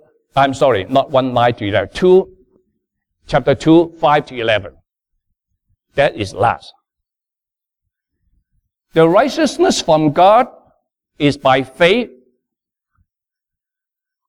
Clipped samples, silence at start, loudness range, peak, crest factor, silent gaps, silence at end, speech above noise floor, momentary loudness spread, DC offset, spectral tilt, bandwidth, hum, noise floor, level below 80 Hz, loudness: under 0.1%; 0.35 s; 8 LU; 0 dBFS; 16 dB; none; 2.2 s; 73 dB; 8 LU; under 0.1%; -5.5 dB/octave; 12.5 kHz; none; -87 dBFS; -46 dBFS; -14 LUFS